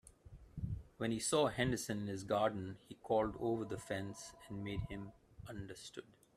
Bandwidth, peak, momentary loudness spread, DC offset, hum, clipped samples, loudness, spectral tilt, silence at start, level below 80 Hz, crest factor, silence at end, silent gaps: 15 kHz; -20 dBFS; 17 LU; under 0.1%; none; under 0.1%; -40 LUFS; -5 dB/octave; 0.05 s; -60 dBFS; 20 dB; 0.25 s; none